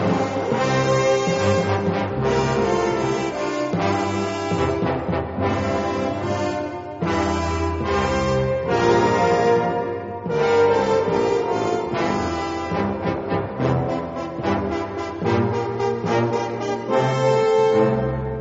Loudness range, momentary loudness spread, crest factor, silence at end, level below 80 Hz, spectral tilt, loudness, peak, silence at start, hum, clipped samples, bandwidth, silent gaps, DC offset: 4 LU; 8 LU; 16 dB; 0 s; -44 dBFS; -5.5 dB/octave; -21 LUFS; -6 dBFS; 0 s; none; under 0.1%; 8 kHz; none; under 0.1%